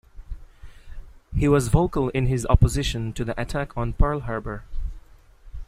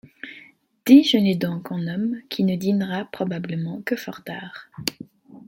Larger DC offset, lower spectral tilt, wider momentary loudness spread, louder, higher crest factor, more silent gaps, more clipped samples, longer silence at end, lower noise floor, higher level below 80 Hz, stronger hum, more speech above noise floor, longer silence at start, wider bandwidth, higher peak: neither; about the same, -6.5 dB/octave vs -6 dB/octave; about the same, 19 LU vs 20 LU; about the same, -24 LUFS vs -22 LUFS; about the same, 22 dB vs 20 dB; neither; neither; about the same, 0.05 s vs 0.05 s; about the same, -48 dBFS vs -51 dBFS; first, -28 dBFS vs -64 dBFS; neither; about the same, 26 dB vs 29 dB; about the same, 0.15 s vs 0.25 s; second, 15 kHz vs 17 kHz; about the same, -2 dBFS vs -2 dBFS